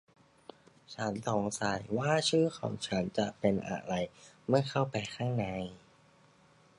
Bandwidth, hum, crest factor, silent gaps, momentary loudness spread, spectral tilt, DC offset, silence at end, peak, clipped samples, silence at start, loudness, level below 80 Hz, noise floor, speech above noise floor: 11.5 kHz; none; 22 dB; none; 9 LU; -5 dB/octave; under 0.1%; 1 s; -12 dBFS; under 0.1%; 0.9 s; -33 LUFS; -64 dBFS; -63 dBFS; 31 dB